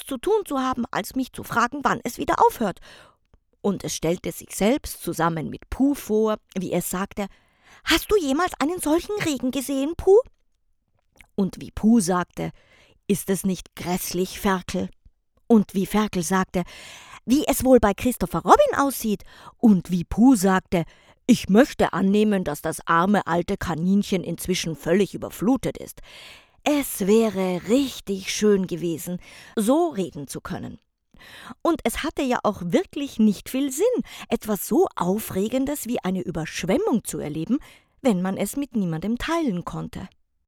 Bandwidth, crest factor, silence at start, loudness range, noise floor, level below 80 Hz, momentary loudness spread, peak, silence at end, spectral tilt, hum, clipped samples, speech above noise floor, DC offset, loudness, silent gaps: 19.5 kHz; 22 dB; 0 s; 5 LU; -67 dBFS; -46 dBFS; 13 LU; 0 dBFS; 0.4 s; -5 dB/octave; none; under 0.1%; 45 dB; under 0.1%; -23 LUFS; none